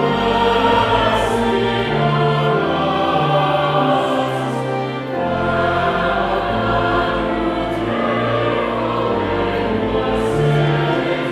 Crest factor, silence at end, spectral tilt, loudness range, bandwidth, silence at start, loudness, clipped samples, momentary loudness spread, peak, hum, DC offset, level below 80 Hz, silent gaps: 14 dB; 0 s; -6.5 dB/octave; 2 LU; 13 kHz; 0 s; -17 LUFS; under 0.1%; 5 LU; -2 dBFS; none; under 0.1%; -36 dBFS; none